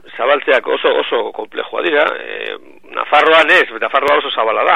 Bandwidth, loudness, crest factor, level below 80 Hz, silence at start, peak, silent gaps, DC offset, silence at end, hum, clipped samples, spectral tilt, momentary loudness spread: 14 kHz; -13 LUFS; 14 dB; -62 dBFS; 0.1 s; 0 dBFS; none; 0.9%; 0 s; none; under 0.1%; -3 dB/octave; 15 LU